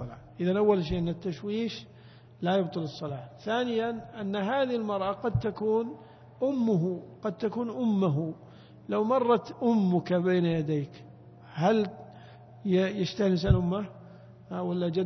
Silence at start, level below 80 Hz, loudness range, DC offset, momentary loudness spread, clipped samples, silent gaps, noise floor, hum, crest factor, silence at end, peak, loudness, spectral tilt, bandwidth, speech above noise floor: 0 s; -48 dBFS; 4 LU; under 0.1%; 13 LU; under 0.1%; none; -50 dBFS; none; 20 dB; 0 s; -8 dBFS; -29 LUFS; -8 dB/octave; 6.4 kHz; 22 dB